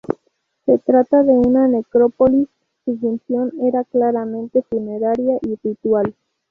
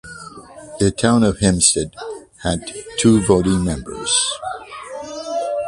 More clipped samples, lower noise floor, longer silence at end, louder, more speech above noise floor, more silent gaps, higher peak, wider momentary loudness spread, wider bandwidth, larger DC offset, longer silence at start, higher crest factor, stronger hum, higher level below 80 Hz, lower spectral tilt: neither; first, -67 dBFS vs -37 dBFS; first, 0.4 s vs 0 s; about the same, -18 LUFS vs -17 LUFS; first, 51 dB vs 20 dB; neither; about the same, -2 dBFS vs 0 dBFS; second, 12 LU vs 19 LU; second, 2.8 kHz vs 11.5 kHz; neither; about the same, 0.1 s vs 0.05 s; about the same, 14 dB vs 18 dB; neither; second, -50 dBFS vs -38 dBFS; first, -10.5 dB/octave vs -4 dB/octave